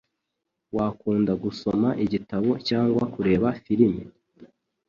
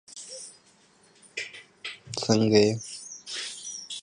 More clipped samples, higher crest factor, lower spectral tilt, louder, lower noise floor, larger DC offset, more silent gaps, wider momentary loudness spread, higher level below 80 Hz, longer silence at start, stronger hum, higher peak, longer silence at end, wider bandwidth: neither; about the same, 18 dB vs 22 dB; first, -8 dB/octave vs -4.5 dB/octave; first, -24 LUFS vs -27 LUFS; first, -81 dBFS vs -60 dBFS; neither; neither; second, 6 LU vs 19 LU; first, -52 dBFS vs -66 dBFS; first, 0.75 s vs 0.1 s; neither; about the same, -6 dBFS vs -8 dBFS; first, 0.45 s vs 0 s; second, 7.2 kHz vs 11.5 kHz